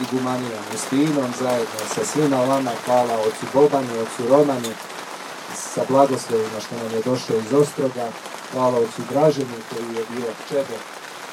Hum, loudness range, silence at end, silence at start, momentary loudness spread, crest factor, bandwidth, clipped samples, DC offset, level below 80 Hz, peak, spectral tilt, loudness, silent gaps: none; 3 LU; 0 s; 0 s; 12 LU; 20 dB; 16.5 kHz; under 0.1%; under 0.1%; -68 dBFS; -2 dBFS; -5 dB/octave; -21 LUFS; none